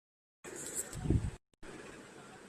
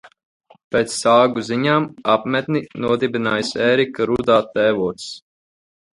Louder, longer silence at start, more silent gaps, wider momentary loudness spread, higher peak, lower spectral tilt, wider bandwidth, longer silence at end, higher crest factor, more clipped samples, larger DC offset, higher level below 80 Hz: second, -39 LUFS vs -18 LUFS; first, 0.45 s vs 0.05 s; second, none vs 0.25-0.40 s, 0.64-0.71 s; first, 18 LU vs 8 LU; second, -16 dBFS vs -2 dBFS; about the same, -5 dB/octave vs -5 dB/octave; first, 15.5 kHz vs 11.5 kHz; second, 0 s vs 0.75 s; first, 24 dB vs 18 dB; neither; neither; first, -48 dBFS vs -54 dBFS